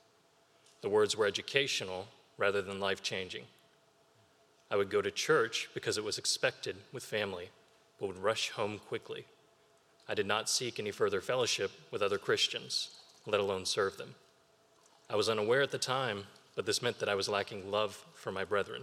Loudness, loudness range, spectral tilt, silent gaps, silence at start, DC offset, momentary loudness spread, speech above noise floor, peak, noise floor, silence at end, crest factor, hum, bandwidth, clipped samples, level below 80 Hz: -34 LUFS; 4 LU; -2.5 dB/octave; none; 0.85 s; under 0.1%; 12 LU; 34 dB; -10 dBFS; -68 dBFS; 0 s; 24 dB; none; 15.5 kHz; under 0.1%; -82 dBFS